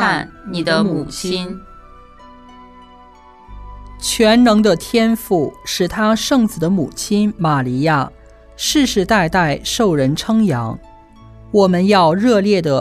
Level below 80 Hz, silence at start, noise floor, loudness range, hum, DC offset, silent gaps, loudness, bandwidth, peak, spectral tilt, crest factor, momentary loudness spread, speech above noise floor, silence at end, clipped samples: -40 dBFS; 0 s; -43 dBFS; 8 LU; none; under 0.1%; none; -15 LUFS; 14 kHz; 0 dBFS; -5 dB/octave; 16 dB; 10 LU; 28 dB; 0 s; under 0.1%